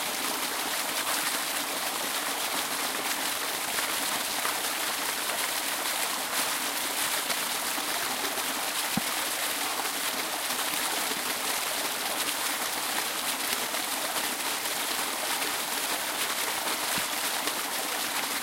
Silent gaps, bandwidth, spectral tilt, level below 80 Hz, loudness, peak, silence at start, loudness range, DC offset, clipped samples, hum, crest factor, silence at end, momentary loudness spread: none; 16 kHz; 0 dB/octave; -68 dBFS; -28 LUFS; -10 dBFS; 0 s; 1 LU; under 0.1%; under 0.1%; none; 20 dB; 0 s; 1 LU